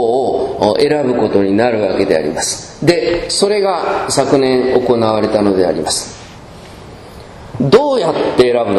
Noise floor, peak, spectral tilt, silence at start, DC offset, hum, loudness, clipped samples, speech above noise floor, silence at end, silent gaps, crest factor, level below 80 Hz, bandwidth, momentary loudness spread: -34 dBFS; 0 dBFS; -4.5 dB/octave; 0 s; under 0.1%; none; -13 LUFS; 0.2%; 21 dB; 0 s; none; 14 dB; -42 dBFS; 13 kHz; 20 LU